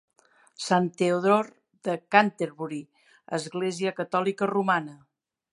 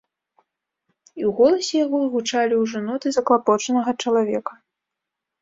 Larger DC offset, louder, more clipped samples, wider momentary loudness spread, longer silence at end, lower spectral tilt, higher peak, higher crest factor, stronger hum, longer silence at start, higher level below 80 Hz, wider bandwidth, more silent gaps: neither; second, -26 LUFS vs -21 LUFS; neither; first, 14 LU vs 8 LU; second, 0.6 s vs 0.9 s; first, -5.5 dB/octave vs -4 dB/octave; about the same, -2 dBFS vs -4 dBFS; first, 24 dB vs 18 dB; neither; second, 0.6 s vs 1.15 s; second, -78 dBFS vs -66 dBFS; first, 11.5 kHz vs 7.8 kHz; neither